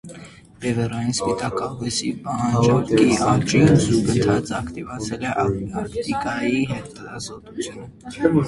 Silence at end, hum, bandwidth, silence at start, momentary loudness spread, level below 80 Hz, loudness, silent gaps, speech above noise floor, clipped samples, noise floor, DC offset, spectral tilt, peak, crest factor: 0 s; none; 11.5 kHz; 0.05 s; 16 LU; -44 dBFS; -21 LUFS; none; 22 dB; under 0.1%; -42 dBFS; under 0.1%; -5.5 dB/octave; -2 dBFS; 20 dB